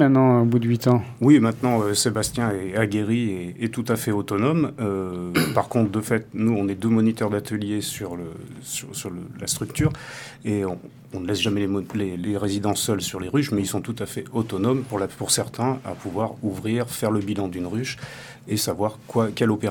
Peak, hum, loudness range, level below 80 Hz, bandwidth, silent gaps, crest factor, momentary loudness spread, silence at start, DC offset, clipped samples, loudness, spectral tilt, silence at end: -2 dBFS; none; 6 LU; -54 dBFS; 19 kHz; none; 20 dB; 11 LU; 0 s; under 0.1%; under 0.1%; -23 LUFS; -5.5 dB/octave; 0 s